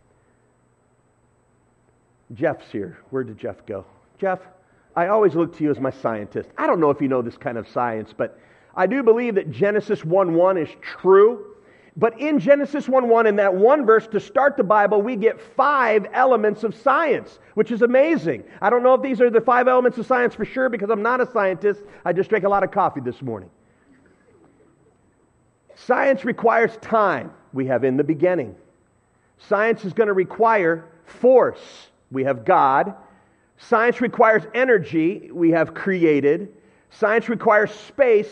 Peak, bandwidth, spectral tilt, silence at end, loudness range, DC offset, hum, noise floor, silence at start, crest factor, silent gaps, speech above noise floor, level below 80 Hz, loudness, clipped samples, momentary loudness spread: -2 dBFS; 8.2 kHz; -7.5 dB/octave; 0 s; 8 LU; under 0.1%; none; -61 dBFS; 2.3 s; 18 dB; none; 42 dB; -64 dBFS; -19 LUFS; under 0.1%; 13 LU